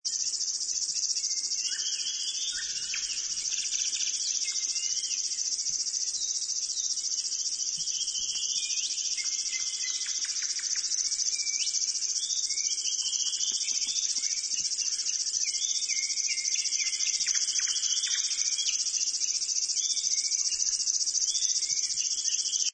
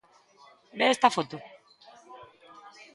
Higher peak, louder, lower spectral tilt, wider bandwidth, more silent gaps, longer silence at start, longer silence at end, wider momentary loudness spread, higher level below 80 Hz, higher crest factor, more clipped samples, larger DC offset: second, -14 dBFS vs -6 dBFS; about the same, -27 LUFS vs -25 LUFS; second, 5 dB/octave vs -3 dB/octave; second, 9.6 kHz vs 11.5 kHz; neither; second, 0.05 s vs 0.75 s; second, 0 s vs 0.7 s; second, 3 LU vs 27 LU; first, -70 dBFS vs -78 dBFS; second, 16 dB vs 24 dB; neither; neither